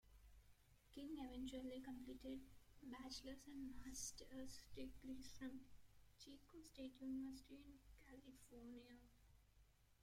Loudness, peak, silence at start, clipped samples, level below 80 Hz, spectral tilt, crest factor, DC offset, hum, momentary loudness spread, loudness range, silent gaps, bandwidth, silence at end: -57 LUFS; -38 dBFS; 0.05 s; under 0.1%; -70 dBFS; -3.5 dB/octave; 18 dB; under 0.1%; 50 Hz at -70 dBFS; 12 LU; 3 LU; none; 16.5 kHz; 0 s